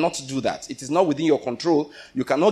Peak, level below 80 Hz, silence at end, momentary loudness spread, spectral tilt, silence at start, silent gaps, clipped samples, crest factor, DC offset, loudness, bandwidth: -6 dBFS; -60 dBFS; 0 s; 10 LU; -5 dB/octave; 0 s; none; under 0.1%; 16 dB; under 0.1%; -23 LUFS; 13.5 kHz